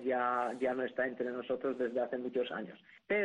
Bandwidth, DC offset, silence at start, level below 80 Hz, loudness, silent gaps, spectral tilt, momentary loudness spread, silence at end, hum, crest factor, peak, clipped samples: 10.5 kHz; under 0.1%; 0 s; -76 dBFS; -36 LUFS; none; -6 dB/octave; 6 LU; 0 s; none; 14 dB; -22 dBFS; under 0.1%